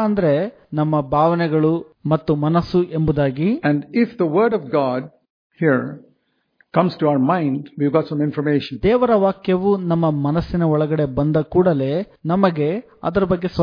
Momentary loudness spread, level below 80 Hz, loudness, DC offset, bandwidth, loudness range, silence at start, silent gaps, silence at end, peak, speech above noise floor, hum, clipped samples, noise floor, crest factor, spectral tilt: 6 LU; -44 dBFS; -19 LUFS; under 0.1%; 5.2 kHz; 3 LU; 0 s; 5.30-5.50 s; 0 s; -2 dBFS; 47 dB; none; under 0.1%; -65 dBFS; 18 dB; -10 dB/octave